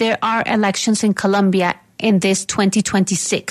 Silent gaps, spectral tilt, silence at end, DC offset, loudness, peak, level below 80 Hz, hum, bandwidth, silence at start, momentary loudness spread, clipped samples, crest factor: none; -4 dB/octave; 0 s; under 0.1%; -17 LUFS; -2 dBFS; -56 dBFS; none; 13.5 kHz; 0 s; 3 LU; under 0.1%; 14 dB